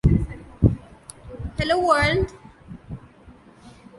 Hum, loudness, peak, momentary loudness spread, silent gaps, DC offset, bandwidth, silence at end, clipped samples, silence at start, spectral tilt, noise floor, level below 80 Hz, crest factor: none; -22 LUFS; -2 dBFS; 24 LU; none; under 0.1%; 11.5 kHz; 0.3 s; under 0.1%; 0.05 s; -6.5 dB/octave; -49 dBFS; -32 dBFS; 22 dB